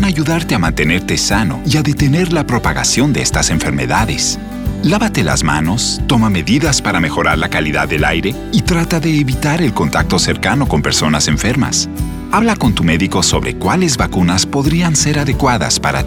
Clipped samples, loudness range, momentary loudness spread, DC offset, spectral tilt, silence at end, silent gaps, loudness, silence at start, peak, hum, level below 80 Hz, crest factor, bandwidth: under 0.1%; 1 LU; 3 LU; under 0.1%; -4 dB/octave; 0 s; none; -13 LUFS; 0 s; 0 dBFS; none; -26 dBFS; 12 dB; 18.5 kHz